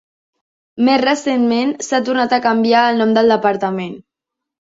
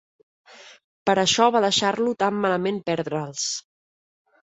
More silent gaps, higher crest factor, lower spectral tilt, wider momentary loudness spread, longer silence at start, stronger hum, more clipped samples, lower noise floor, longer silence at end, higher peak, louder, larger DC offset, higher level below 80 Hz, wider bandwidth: second, none vs 0.84-1.06 s; about the same, 16 dB vs 20 dB; first, -4.5 dB/octave vs -3 dB/octave; second, 7 LU vs 10 LU; first, 0.75 s vs 0.6 s; neither; neither; second, -82 dBFS vs under -90 dBFS; second, 0.7 s vs 0.9 s; first, 0 dBFS vs -4 dBFS; first, -15 LUFS vs -22 LUFS; neither; first, -60 dBFS vs -66 dBFS; about the same, 7.8 kHz vs 8.4 kHz